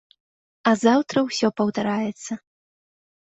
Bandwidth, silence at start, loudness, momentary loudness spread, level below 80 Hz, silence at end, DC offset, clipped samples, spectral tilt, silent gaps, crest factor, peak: 8.2 kHz; 0.65 s; -22 LUFS; 15 LU; -66 dBFS; 0.9 s; under 0.1%; under 0.1%; -5 dB/octave; none; 20 dB; -4 dBFS